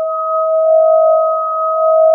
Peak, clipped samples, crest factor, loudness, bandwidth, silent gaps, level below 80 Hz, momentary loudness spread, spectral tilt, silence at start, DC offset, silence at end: -2 dBFS; under 0.1%; 10 dB; -12 LUFS; 1.4 kHz; none; under -90 dBFS; 6 LU; -5 dB/octave; 0 s; under 0.1%; 0 s